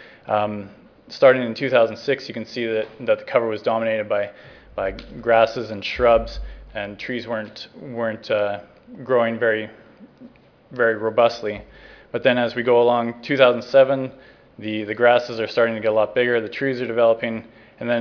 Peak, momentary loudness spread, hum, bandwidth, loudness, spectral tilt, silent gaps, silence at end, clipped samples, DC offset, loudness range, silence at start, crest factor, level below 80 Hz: 0 dBFS; 16 LU; none; 5.4 kHz; -21 LUFS; -6 dB/octave; none; 0 s; under 0.1%; under 0.1%; 5 LU; 0 s; 22 dB; -46 dBFS